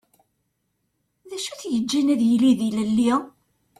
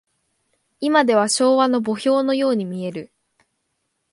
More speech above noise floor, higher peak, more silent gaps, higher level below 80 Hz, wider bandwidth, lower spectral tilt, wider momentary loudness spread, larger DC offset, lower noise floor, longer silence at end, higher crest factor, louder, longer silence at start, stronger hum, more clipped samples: about the same, 53 dB vs 55 dB; second, -8 dBFS vs -2 dBFS; neither; first, -62 dBFS vs -72 dBFS; first, 13.5 kHz vs 11.5 kHz; about the same, -5 dB/octave vs -4 dB/octave; about the same, 13 LU vs 12 LU; neither; about the same, -74 dBFS vs -73 dBFS; second, 0.5 s vs 1.05 s; about the same, 16 dB vs 18 dB; about the same, -21 LUFS vs -19 LUFS; first, 1.25 s vs 0.8 s; first, 50 Hz at -65 dBFS vs none; neither